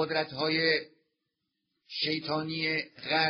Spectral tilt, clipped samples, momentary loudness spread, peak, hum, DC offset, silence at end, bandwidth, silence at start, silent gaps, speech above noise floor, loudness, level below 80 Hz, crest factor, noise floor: -1.5 dB/octave; under 0.1%; 6 LU; -12 dBFS; none; under 0.1%; 0 s; 6.4 kHz; 0 s; none; 53 dB; -30 LUFS; -72 dBFS; 20 dB; -83 dBFS